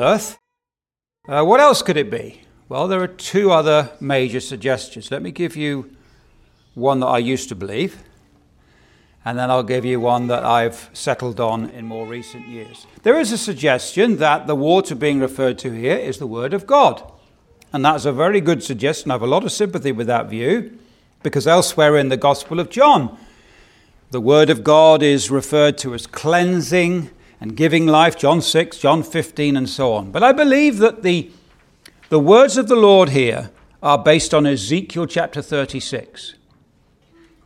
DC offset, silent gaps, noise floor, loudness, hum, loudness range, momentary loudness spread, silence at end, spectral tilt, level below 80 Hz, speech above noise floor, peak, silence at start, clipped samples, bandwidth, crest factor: under 0.1%; none; under -90 dBFS; -16 LUFS; none; 8 LU; 15 LU; 1.15 s; -5 dB/octave; -54 dBFS; over 74 dB; 0 dBFS; 0 s; under 0.1%; 16 kHz; 16 dB